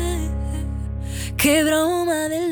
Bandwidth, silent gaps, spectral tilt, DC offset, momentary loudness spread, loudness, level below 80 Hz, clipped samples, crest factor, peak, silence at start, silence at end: over 20 kHz; none; -4.5 dB/octave; under 0.1%; 11 LU; -21 LUFS; -30 dBFS; under 0.1%; 16 dB; -6 dBFS; 0 s; 0 s